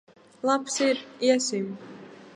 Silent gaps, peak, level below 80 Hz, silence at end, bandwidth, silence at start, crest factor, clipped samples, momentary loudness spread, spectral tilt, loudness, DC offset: none; -8 dBFS; -80 dBFS; 0.05 s; 11.5 kHz; 0.45 s; 20 dB; under 0.1%; 19 LU; -3 dB/octave; -26 LUFS; under 0.1%